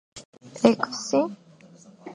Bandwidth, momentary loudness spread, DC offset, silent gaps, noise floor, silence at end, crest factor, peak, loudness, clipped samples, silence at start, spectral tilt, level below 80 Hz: 10.5 kHz; 24 LU; under 0.1%; 0.25-0.33 s; -51 dBFS; 0 s; 24 dB; -2 dBFS; -24 LUFS; under 0.1%; 0.15 s; -4.5 dB/octave; -68 dBFS